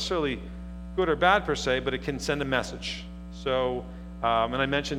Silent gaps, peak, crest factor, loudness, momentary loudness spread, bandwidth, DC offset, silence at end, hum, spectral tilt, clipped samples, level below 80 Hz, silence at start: none; -6 dBFS; 22 dB; -27 LUFS; 14 LU; 15.5 kHz; under 0.1%; 0 s; 60 Hz at -40 dBFS; -4.5 dB/octave; under 0.1%; -42 dBFS; 0 s